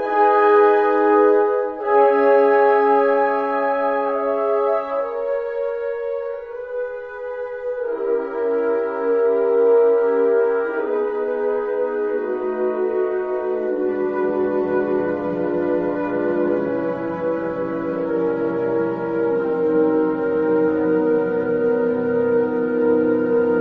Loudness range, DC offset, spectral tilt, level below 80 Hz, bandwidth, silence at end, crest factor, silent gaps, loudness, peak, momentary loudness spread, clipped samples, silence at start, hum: 7 LU; under 0.1%; -9 dB/octave; -58 dBFS; 4.6 kHz; 0 s; 14 dB; none; -19 LUFS; -4 dBFS; 9 LU; under 0.1%; 0 s; none